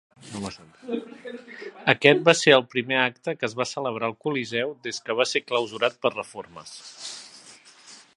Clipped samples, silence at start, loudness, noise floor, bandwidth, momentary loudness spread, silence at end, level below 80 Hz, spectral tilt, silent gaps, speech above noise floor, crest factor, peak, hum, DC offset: under 0.1%; 0.25 s; -23 LUFS; -50 dBFS; 11.5 kHz; 22 LU; 0.2 s; -68 dBFS; -3.5 dB/octave; none; 25 dB; 26 dB; 0 dBFS; none; under 0.1%